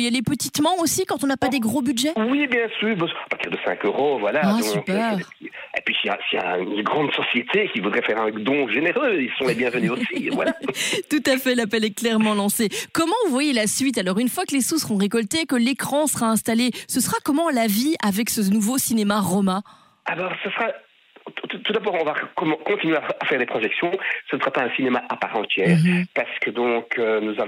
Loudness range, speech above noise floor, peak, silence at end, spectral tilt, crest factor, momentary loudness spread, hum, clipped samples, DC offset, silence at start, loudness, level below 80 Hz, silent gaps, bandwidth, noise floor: 3 LU; 22 dB; -6 dBFS; 0 s; -4 dB/octave; 16 dB; 5 LU; none; under 0.1%; under 0.1%; 0 s; -22 LUFS; -64 dBFS; none; 16 kHz; -44 dBFS